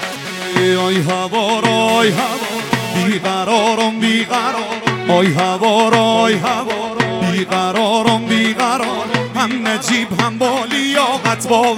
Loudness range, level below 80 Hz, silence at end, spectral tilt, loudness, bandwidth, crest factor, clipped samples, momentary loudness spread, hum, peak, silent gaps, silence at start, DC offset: 2 LU; -56 dBFS; 0 s; -4 dB/octave; -15 LUFS; 17 kHz; 16 dB; under 0.1%; 6 LU; none; 0 dBFS; none; 0 s; under 0.1%